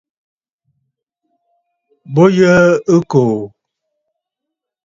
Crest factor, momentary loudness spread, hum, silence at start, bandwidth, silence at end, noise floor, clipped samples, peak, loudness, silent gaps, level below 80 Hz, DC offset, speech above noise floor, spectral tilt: 16 dB; 12 LU; none; 2.1 s; 7.6 kHz; 1.4 s; -80 dBFS; under 0.1%; 0 dBFS; -12 LUFS; none; -54 dBFS; under 0.1%; 70 dB; -7 dB/octave